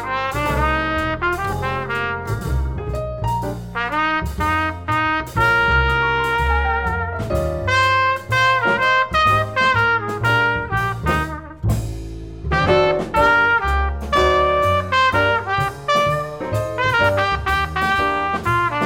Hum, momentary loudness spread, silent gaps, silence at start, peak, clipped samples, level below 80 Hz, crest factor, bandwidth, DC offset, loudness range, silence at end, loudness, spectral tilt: none; 8 LU; none; 0 s; -4 dBFS; under 0.1%; -30 dBFS; 14 dB; 17 kHz; 0.3%; 5 LU; 0 s; -18 LUFS; -5.5 dB/octave